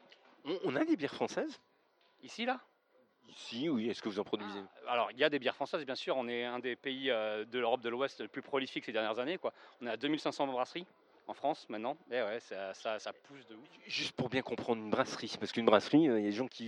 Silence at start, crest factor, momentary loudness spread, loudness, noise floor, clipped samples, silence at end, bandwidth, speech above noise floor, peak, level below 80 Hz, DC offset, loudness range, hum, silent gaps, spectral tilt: 0.45 s; 24 dB; 14 LU; -36 LUFS; -71 dBFS; under 0.1%; 0 s; 10.5 kHz; 35 dB; -12 dBFS; -82 dBFS; under 0.1%; 5 LU; none; none; -5 dB/octave